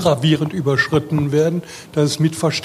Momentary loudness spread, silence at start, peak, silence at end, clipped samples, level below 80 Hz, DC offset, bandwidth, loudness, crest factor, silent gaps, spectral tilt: 4 LU; 0 s; -2 dBFS; 0 s; under 0.1%; -50 dBFS; under 0.1%; 15 kHz; -18 LUFS; 16 dB; none; -5.5 dB/octave